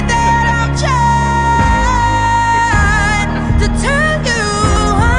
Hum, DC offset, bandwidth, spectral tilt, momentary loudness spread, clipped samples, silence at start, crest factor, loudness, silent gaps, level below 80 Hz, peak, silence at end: none; under 0.1%; 11 kHz; -5 dB/octave; 3 LU; under 0.1%; 0 s; 10 dB; -12 LUFS; none; -20 dBFS; -2 dBFS; 0 s